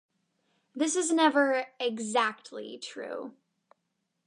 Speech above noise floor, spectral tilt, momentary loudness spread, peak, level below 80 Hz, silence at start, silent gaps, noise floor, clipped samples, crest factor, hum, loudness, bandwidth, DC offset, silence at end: 52 dB; -2 dB/octave; 18 LU; -12 dBFS; -88 dBFS; 0.75 s; none; -80 dBFS; under 0.1%; 20 dB; none; -28 LUFS; 11 kHz; under 0.1%; 0.95 s